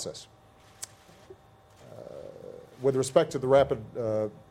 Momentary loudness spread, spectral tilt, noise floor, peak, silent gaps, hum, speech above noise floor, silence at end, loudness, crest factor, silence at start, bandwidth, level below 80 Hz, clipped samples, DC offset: 23 LU; -5.5 dB/octave; -56 dBFS; -8 dBFS; none; none; 29 dB; 0.15 s; -27 LUFS; 22 dB; 0 s; 16 kHz; -60 dBFS; under 0.1%; under 0.1%